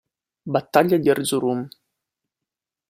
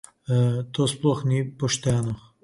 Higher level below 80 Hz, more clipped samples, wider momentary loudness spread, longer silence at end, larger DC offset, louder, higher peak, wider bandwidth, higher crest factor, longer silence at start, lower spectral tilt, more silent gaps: second, -64 dBFS vs -52 dBFS; neither; first, 16 LU vs 4 LU; first, 1.2 s vs 0.25 s; neither; first, -21 LUFS vs -24 LUFS; first, -2 dBFS vs -8 dBFS; first, 16 kHz vs 11.5 kHz; about the same, 20 dB vs 16 dB; first, 0.45 s vs 0.3 s; about the same, -5 dB/octave vs -5.5 dB/octave; neither